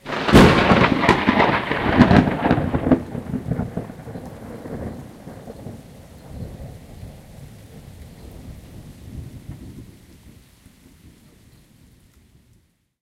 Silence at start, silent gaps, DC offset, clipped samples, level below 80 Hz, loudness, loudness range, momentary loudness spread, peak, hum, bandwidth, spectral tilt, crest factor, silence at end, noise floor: 0.05 s; none; under 0.1%; under 0.1%; -36 dBFS; -17 LUFS; 24 LU; 27 LU; 0 dBFS; none; 16 kHz; -6.5 dB/octave; 22 dB; 3.2 s; -60 dBFS